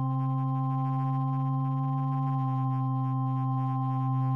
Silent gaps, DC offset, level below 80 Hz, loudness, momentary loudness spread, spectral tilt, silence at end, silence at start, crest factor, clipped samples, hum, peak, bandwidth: none; under 0.1%; -76 dBFS; -29 LUFS; 0 LU; -11.5 dB/octave; 0 s; 0 s; 8 dB; under 0.1%; none; -20 dBFS; 3.3 kHz